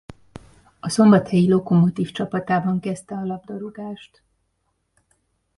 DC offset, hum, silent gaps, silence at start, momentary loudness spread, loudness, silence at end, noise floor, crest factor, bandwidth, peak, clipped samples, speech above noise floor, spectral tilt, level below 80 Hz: under 0.1%; none; none; 0.1 s; 19 LU; -20 LUFS; 1.55 s; -71 dBFS; 18 dB; 11.5 kHz; -2 dBFS; under 0.1%; 52 dB; -7 dB/octave; -56 dBFS